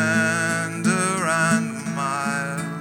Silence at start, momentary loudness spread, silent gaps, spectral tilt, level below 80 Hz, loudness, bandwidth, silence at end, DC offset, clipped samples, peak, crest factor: 0 s; 7 LU; none; -4 dB/octave; -64 dBFS; -22 LUFS; 16.5 kHz; 0 s; under 0.1%; under 0.1%; -6 dBFS; 16 dB